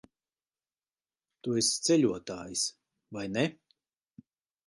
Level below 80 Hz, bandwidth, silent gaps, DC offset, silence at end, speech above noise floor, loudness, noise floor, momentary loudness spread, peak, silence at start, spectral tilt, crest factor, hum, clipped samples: -70 dBFS; 11.5 kHz; none; under 0.1%; 1.15 s; over 60 dB; -30 LUFS; under -90 dBFS; 14 LU; -14 dBFS; 1.45 s; -3.5 dB/octave; 20 dB; none; under 0.1%